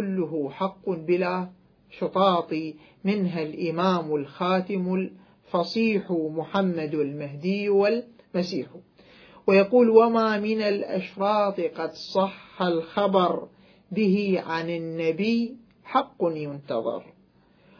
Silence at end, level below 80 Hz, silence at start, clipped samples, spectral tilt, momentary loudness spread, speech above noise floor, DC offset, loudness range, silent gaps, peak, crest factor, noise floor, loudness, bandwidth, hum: 0.75 s; -70 dBFS; 0 s; under 0.1%; -7.5 dB/octave; 10 LU; 35 dB; under 0.1%; 5 LU; none; -4 dBFS; 22 dB; -59 dBFS; -25 LUFS; 5.4 kHz; none